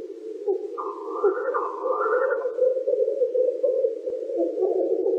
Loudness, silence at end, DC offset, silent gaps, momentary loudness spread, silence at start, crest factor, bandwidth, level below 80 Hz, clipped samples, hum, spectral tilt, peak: -25 LUFS; 0 s; under 0.1%; none; 8 LU; 0 s; 14 dB; 5.6 kHz; -82 dBFS; under 0.1%; none; -5.5 dB/octave; -12 dBFS